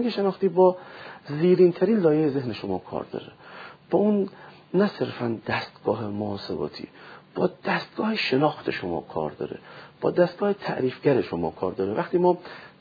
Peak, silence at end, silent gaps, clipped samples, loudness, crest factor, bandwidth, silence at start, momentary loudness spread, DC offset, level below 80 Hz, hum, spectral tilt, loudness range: -6 dBFS; 0.15 s; none; under 0.1%; -25 LUFS; 18 dB; 5 kHz; 0 s; 17 LU; under 0.1%; -64 dBFS; none; -8.5 dB/octave; 5 LU